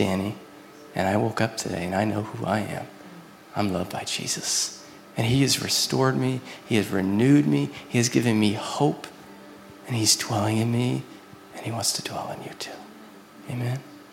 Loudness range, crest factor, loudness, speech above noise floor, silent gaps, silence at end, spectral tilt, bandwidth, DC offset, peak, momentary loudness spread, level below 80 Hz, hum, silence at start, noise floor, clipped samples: 6 LU; 20 dB; -25 LUFS; 22 dB; none; 0 s; -4.5 dB/octave; 17 kHz; under 0.1%; -6 dBFS; 21 LU; -62 dBFS; none; 0 s; -46 dBFS; under 0.1%